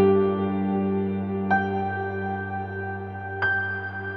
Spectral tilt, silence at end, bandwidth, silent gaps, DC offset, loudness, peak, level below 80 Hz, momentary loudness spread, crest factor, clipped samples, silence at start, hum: -9.5 dB/octave; 0 s; 5 kHz; none; under 0.1%; -26 LUFS; -10 dBFS; -64 dBFS; 8 LU; 16 dB; under 0.1%; 0 s; none